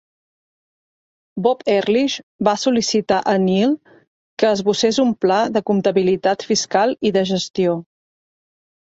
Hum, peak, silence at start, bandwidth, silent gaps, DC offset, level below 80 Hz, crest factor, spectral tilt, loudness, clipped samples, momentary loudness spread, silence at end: none; -2 dBFS; 1.35 s; 8 kHz; 2.23-2.39 s, 4.07-4.37 s; under 0.1%; -60 dBFS; 18 dB; -4.5 dB/octave; -18 LUFS; under 0.1%; 4 LU; 1.15 s